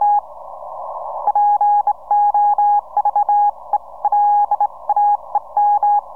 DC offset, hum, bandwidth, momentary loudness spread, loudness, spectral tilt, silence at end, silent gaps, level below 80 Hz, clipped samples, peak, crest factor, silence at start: 0.8%; none; 1.9 kHz; 13 LU; -16 LUFS; -5.5 dB/octave; 0 s; none; -60 dBFS; under 0.1%; -8 dBFS; 8 dB; 0 s